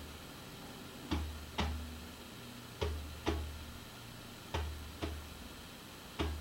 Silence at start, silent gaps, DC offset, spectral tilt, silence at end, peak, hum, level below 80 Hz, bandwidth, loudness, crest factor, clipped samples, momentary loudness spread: 0 s; none; under 0.1%; -5 dB/octave; 0 s; -18 dBFS; none; -48 dBFS; 16 kHz; -44 LUFS; 24 dB; under 0.1%; 10 LU